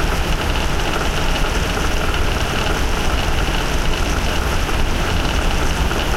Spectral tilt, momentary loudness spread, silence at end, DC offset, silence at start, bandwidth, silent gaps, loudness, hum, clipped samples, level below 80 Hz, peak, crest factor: -4 dB/octave; 1 LU; 0 s; under 0.1%; 0 s; 16 kHz; none; -20 LUFS; none; under 0.1%; -20 dBFS; -4 dBFS; 12 dB